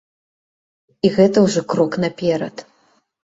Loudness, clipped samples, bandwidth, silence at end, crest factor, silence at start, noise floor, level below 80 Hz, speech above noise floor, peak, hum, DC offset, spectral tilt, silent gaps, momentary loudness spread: -17 LUFS; under 0.1%; 8 kHz; 0.65 s; 18 dB; 1.05 s; -60 dBFS; -56 dBFS; 44 dB; -2 dBFS; none; under 0.1%; -6 dB/octave; none; 11 LU